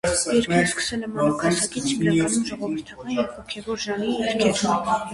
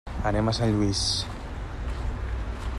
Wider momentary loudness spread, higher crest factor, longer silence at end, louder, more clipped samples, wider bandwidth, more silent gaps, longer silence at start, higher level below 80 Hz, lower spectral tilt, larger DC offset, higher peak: about the same, 9 LU vs 11 LU; about the same, 18 dB vs 16 dB; about the same, 0 s vs 0 s; first, -23 LUFS vs -28 LUFS; neither; about the same, 11.5 kHz vs 12 kHz; neither; about the same, 0.05 s vs 0.05 s; second, -50 dBFS vs -34 dBFS; about the same, -4 dB/octave vs -5 dB/octave; neither; first, -6 dBFS vs -12 dBFS